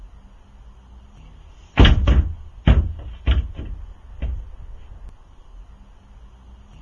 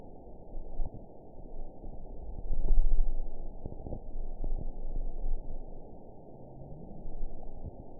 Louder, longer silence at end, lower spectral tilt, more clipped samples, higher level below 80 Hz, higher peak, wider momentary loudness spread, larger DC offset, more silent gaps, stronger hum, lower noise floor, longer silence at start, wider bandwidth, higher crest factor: first, -20 LUFS vs -42 LUFS; first, 1.2 s vs 0 s; second, -7 dB/octave vs -15 dB/octave; neither; first, -24 dBFS vs -32 dBFS; first, 0 dBFS vs -10 dBFS; first, 27 LU vs 16 LU; second, under 0.1% vs 0.3%; neither; neither; second, -45 dBFS vs -49 dBFS; about the same, 0 s vs 0 s; first, 6.8 kHz vs 1 kHz; about the same, 22 dB vs 18 dB